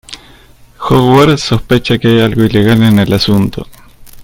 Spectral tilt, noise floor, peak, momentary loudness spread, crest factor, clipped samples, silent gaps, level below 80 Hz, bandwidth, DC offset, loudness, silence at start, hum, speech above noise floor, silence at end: -6.5 dB/octave; -40 dBFS; 0 dBFS; 14 LU; 10 dB; 0.4%; none; -34 dBFS; 17 kHz; under 0.1%; -9 LUFS; 0.1 s; none; 31 dB; 0 s